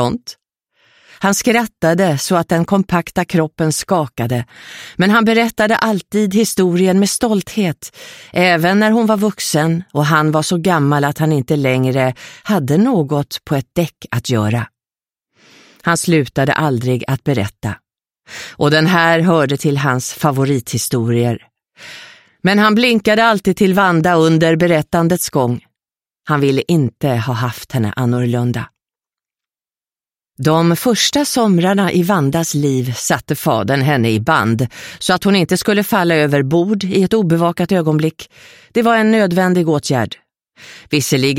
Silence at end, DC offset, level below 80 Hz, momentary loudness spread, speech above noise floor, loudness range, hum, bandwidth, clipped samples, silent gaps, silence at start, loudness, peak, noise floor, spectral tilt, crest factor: 0 s; under 0.1%; -50 dBFS; 9 LU; over 76 dB; 4 LU; none; 16.5 kHz; under 0.1%; none; 0 s; -15 LUFS; 0 dBFS; under -90 dBFS; -5.5 dB/octave; 16 dB